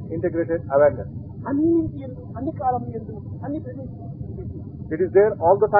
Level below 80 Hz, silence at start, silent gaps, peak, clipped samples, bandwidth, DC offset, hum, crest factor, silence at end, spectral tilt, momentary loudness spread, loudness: -46 dBFS; 0 s; none; -4 dBFS; under 0.1%; 3.6 kHz; under 0.1%; none; 20 dB; 0 s; -13.5 dB/octave; 17 LU; -22 LUFS